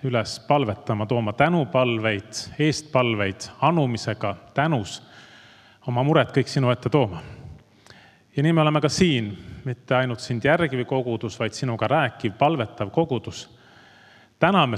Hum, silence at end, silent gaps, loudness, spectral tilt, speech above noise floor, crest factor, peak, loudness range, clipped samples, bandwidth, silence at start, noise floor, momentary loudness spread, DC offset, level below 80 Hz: none; 0 s; none; -23 LUFS; -6 dB/octave; 30 dB; 22 dB; -2 dBFS; 2 LU; under 0.1%; 12 kHz; 0.05 s; -52 dBFS; 13 LU; under 0.1%; -56 dBFS